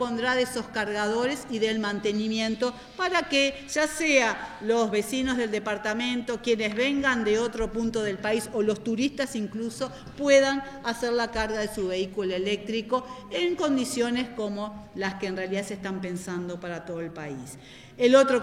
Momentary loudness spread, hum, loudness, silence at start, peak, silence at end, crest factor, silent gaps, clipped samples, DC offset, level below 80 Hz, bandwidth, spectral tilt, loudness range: 12 LU; none; -27 LUFS; 0 s; -6 dBFS; 0 s; 22 dB; none; under 0.1%; under 0.1%; -52 dBFS; 15.5 kHz; -4 dB/octave; 4 LU